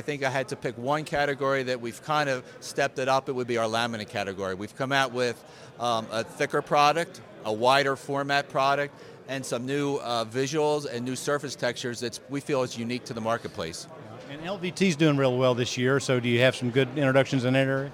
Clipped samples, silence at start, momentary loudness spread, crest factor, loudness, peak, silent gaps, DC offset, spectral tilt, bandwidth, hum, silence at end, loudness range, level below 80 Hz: under 0.1%; 0 s; 12 LU; 20 dB; -27 LUFS; -6 dBFS; none; under 0.1%; -5 dB/octave; over 20 kHz; none; 0 s; 5 LU; -66 dBFS